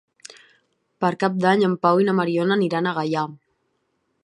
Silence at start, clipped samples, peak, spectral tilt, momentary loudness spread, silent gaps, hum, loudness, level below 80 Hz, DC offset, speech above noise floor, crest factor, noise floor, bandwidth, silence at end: 1 s; under 0.1%; -4 dBFS; -7 dB/octave; 7 LU; none; none; -21 LUFS; -72 dBFS; under 0.1%; 51 dB; 20 dB; -71 dBFS; 11 kHz; 0.9 s